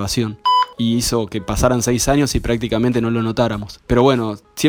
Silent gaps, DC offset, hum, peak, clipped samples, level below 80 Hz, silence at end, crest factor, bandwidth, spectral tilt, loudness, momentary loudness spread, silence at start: none; under 0.1%; none; -2 dBFS; under 0.1%; -32 dBFS; 0 s; 16 dB; over 20 kHz; -5 dB/octave; -18 LUFS; 5 LU; 0 s